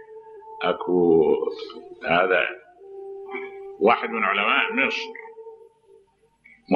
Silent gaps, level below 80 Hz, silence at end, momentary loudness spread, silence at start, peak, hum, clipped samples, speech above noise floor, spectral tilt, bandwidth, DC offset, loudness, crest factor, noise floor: none; -64 dBFS; 0 s; 23 LU; 0 s; -4 dBFS; none; under 0.1%; 38 dB; -6 dB/octave; 7 kHz; under 0.1%; -22 LUFS; 20 dB; -59 dBFS